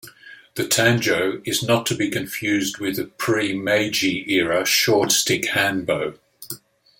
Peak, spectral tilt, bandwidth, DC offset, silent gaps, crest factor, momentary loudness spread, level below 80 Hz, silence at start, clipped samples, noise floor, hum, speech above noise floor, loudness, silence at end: -2 dBFS; -3 dB/octave; 17 kHz; under 0.1%; none; 20 dB; 11 LU; -60 dBFS; 0.05 s; under 0.1%; -45 dBFS; none; 24 dB; -20 LUFS; 0.45 s